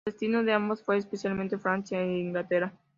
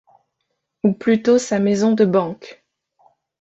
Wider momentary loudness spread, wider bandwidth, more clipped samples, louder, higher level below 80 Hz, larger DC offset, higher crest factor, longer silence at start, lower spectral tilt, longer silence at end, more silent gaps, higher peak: second, 5 LU vs 8 LU; about the same, 7.6 kHz vs 8.2 kHz; neither; second, -29 LUFS vs -18 LUFS; second, -68 dBFS vs -62 dBFS; neither; about the same, 20 dB vs 16 dB; second, 0.05 s vs 0.85 s; about the same, -6.5 dB/octave vs -6 dB/octave; second, 0.25 s vs 0.9 s; neither; second, -10 dBFS vs -4 dBFS